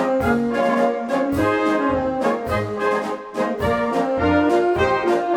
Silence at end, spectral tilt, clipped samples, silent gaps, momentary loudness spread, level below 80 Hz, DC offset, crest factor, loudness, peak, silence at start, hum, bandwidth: 0 s; -6.5 dB/octave; under 0.1%; none; 5 LU; -42 dBFS; under 0.1%; 14 dB; -20 LUFS; -6 dBFS; 0 s; none; 18.5 kHz